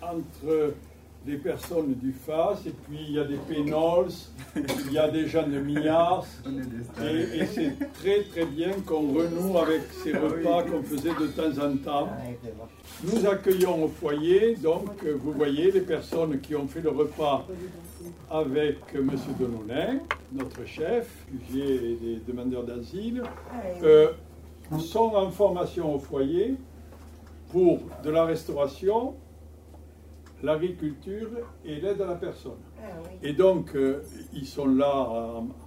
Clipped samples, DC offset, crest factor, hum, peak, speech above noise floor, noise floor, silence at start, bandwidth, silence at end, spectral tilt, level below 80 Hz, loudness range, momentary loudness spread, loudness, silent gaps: under 0.1%; under 0.1%; 20 dB; none; -6 dBFS; 21 dB; -48 dBFS; 0 s; 16 kHz; 0 s; -6.5 dB/octave; -50 dBFS; 6 LU; 15 LU; -27 LUFS; none